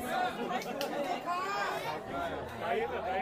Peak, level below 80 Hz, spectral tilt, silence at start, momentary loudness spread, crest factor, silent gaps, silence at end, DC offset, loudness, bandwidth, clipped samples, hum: -18 dBFS; -62 dBFS; -4 dB/octave; 0 s; 4 LU; 18 dB; none; 0 s; under 0.1%; -35 LUFS; 15.5 kHz; under 0.1%; none